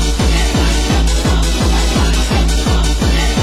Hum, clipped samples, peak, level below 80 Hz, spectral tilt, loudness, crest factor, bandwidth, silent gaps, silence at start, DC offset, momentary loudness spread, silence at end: none; under 0.1%; -2 dBFS; -14 dBFS; -4.5 dB/octave; -14 LUFS; 12 dB; 16 kHz; none; 0 s; under 0.1%; 1 LU; 0 s